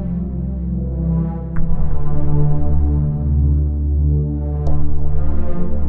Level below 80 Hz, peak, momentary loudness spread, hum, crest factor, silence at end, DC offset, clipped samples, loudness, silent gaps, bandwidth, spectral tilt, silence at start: -18 dBFS; -2 dBFS; 6 LU; none; 12 dB; 0 s; under 0.1%; under 0.1%; -20 LUFS; none; 1.9 kHz; -12.5 dB/octave; 0 s